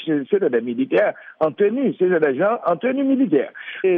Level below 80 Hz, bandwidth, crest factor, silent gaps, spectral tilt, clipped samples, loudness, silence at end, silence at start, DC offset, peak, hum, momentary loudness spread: -70 dBFS; 4.2 kHz; 14 dB; none; -9.5 dB/octave; under 0.1%; -20 LUFS; 0 s; 0 s; under 0.1%; -6 dBFS; none; 5 LU